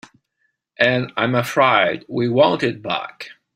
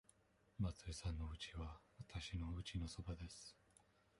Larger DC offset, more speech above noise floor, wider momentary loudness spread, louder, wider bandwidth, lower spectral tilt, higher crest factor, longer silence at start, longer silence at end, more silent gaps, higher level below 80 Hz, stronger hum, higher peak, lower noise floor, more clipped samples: neither; first, 52 dB vs 27 dB; about the same, 10 LU vs 10 LU; first, -18 LUFS vs -50 LUFS; first, 16 kHz vs 11.5 kHz; about the same, -5.5 dB/octave vs -5 dB/octave; about the same, 20 dB vs 18 dB; first, 0.8 s vs 0.6 s; second, 0.25 s vs 0.65 s; neither; second, -62 dBFS vs -56 dBFS; neither; first, 0 dBFS vs -32 dBFS; second, -70 dBFS vs -75 dBFS; neither